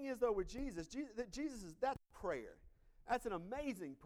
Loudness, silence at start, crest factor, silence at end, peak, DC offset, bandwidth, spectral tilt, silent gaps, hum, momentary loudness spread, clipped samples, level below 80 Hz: -44 LUFS; 0 s; 18 dB; 0 s; -26 dBFS; under 0.1%; 17 kHz; -5 dB/octave; none; none; 8 LU; under 0.1%; -60 dBFS